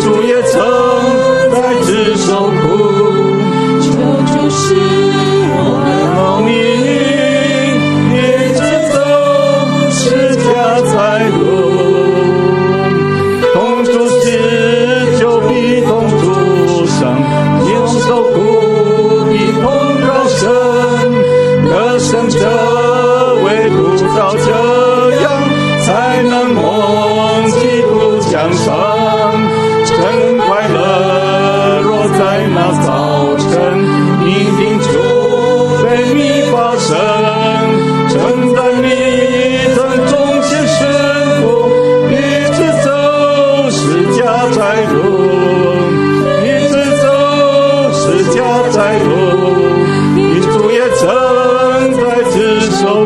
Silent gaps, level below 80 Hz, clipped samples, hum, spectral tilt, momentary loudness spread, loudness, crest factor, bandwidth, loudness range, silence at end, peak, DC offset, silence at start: none; -42 dBFS; under 0.1%; none; -5.5 dB/octave; 2 LU; -10 LUFS; 10 dB; 12.5 kHz; 1 LU; 0 s; 0 dBFS; under 0.1%; 0 s